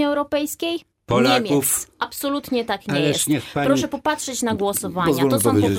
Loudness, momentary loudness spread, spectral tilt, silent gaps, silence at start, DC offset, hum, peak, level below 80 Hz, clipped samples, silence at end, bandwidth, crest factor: -21 LUFS; 8 LU; -4 dB/octave; none; 0 s; under 0.1%; none; -4 dBFS; -54 dBFS; under 0.1%; 0 s; 17 kHz; 18 dB